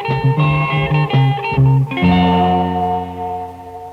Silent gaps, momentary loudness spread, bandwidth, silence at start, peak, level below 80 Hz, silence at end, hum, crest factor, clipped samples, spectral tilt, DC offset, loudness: none; 11 LU; 5 kHz; 0 s; -2 dBFS; -36 dBFS; 0 s; none; 12 dB; under 0.1%; -8.5 dB/octave; under 0.1%; -15 LUFS